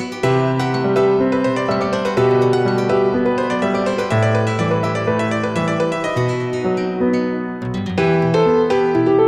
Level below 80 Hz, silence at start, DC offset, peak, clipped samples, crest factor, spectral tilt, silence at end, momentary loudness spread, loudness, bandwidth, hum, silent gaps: -50 dBFS; 0 s; under 0.1%; -4 dBFS; under 0.1%; 12 dB; -7 dB/octave; 0 s; 5 LU; -17 LUFS; 11 kHz; none; none